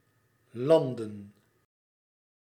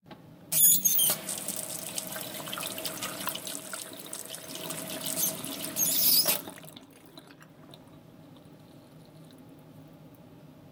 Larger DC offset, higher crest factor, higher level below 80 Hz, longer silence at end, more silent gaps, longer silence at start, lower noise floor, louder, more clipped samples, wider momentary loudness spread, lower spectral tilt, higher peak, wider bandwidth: neither; about the same, 22 dB vs 26 dB; second, -82 dBFS vs -74 dBFS; first, 1.15 s vs 0 s; neither; first, 0.55 s vs 0.05 s; first, -69 dBFS vs -52 dBFS; about the same, -27 LUFS vs -27 LUFS; neither; first, 22 LU vs 18 LU; first, -7.5 dB/octave vs -0.5 dB/octave; second, -10 dBFS vs -6 dBFS; second, 14 kHz vs 19 kHz